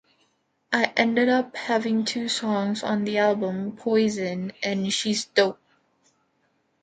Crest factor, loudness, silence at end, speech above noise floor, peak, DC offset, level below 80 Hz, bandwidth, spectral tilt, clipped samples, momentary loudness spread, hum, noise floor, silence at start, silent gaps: 22 dB; -24 LUFS; 1.3 s; 46 dB; -4 dBFS; under 0.1%; -70 dBFS; 9.4 kHz; -4 dB/octave; under 0.1%; 7 LU; none; -69 dBFS; 0.7 s; none